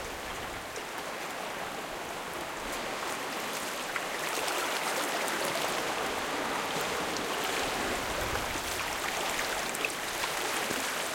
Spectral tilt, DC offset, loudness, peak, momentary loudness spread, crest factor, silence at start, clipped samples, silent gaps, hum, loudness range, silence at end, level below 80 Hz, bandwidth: -1.5 dB/octave; under 0.1%; -32 LUFS; -14 dBFS; 7 LU; 20 dB; 0 s; under 0.1%; none; none; 4 LU; 0 s; -56 dBFS; 17 kHz